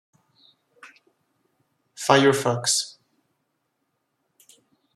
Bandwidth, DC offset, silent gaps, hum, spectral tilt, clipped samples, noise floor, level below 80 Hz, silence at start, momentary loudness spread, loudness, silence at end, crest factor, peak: 14.5 kHz; under 0.1%; none; none; -3.5 dB/octave; under 0.1%; -75 dBFS; -72 dBFS; 0.85 s; 12 LU; -20 LUFS; 2.05 s; 26 dB; -2 dBFS